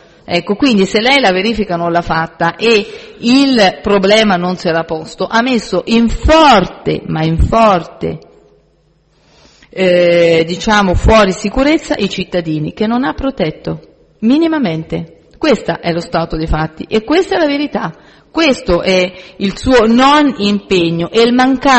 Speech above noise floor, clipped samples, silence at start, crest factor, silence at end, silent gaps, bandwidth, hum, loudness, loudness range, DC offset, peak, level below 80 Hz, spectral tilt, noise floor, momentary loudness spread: 41 dB; under 0.1%; 0.3 s; 12 dB; 0 s; none; 8.8 kHz; none; -12 LUFS; 4 LU; under 0.1%; 0 dBFS; -28 dBFS; -5.5 dB/octave; -53 dBFS; 10 LU